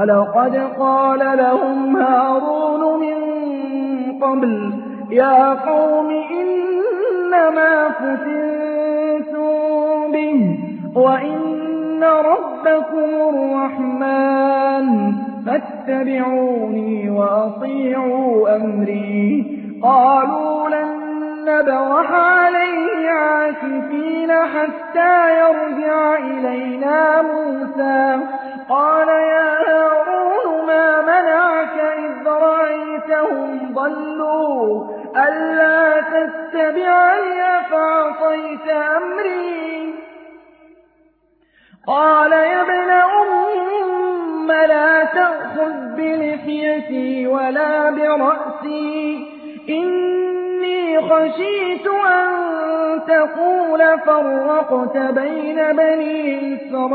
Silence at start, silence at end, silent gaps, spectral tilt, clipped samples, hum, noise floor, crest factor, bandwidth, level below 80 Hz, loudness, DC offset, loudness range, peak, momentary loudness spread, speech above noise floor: 0 s; 0 s; none; -10 dB/octave; under 0.1%; none; -58 dBFS; 14 dB; 4.6 kHz; -68 dBFS; -16 LUFS; under 0.1%; 4 LU; -2 dBFS; 9 LU; 42 dB